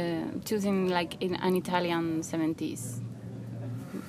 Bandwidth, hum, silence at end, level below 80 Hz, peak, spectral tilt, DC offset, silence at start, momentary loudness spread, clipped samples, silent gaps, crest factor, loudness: 15.5 kHz; none; 0 s; -66 dBFS; -10 dBFS; -5.5 dB/octave; under 0.1%; 0 s; 11 LU; under 0.1%; none; 20 dB; -31 LUFS